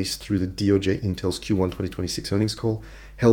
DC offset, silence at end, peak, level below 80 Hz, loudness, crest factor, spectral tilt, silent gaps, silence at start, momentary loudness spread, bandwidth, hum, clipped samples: under 0.1%; 0 s; -4 dBFS; -44 dBFS; -25 LUFS; 20 dB; -6 dB/octave; none; 0 s; 7 LU; 18.5 kHz; none; under 0.1%